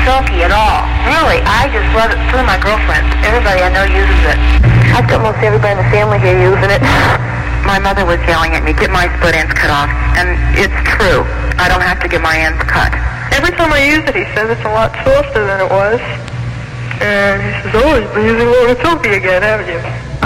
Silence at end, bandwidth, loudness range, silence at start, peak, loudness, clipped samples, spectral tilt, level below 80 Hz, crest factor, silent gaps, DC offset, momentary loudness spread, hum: 0 s; 14.5 kHz; 3 LU; 0 s; -2 dBFS; -11 LUFS; under 0.1%; -5.5 dB/octave; -16 dBFS; 8 dB; none; under 0.1%; 5 LU; none